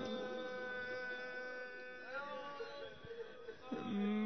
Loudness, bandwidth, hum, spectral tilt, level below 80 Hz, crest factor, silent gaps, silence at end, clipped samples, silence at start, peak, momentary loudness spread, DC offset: -46 LUFS; 6.2 kHz; none; -4 dB/octave; -76 dBFS; 14 dB; none; 0 s; under 0.1%; 0 s; -30 dBFS; 8 LU; 0.1%